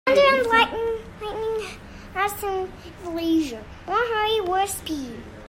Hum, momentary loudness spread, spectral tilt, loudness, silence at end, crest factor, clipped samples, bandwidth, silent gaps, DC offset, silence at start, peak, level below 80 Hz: none; 17 LU; -3.5 dB/octave; -23 LUFS; 0 s; 18 dB; under 0.1%; 16 kHz; none; under 0.1%; 0.05 s; -6 dBFS; -46 dBFS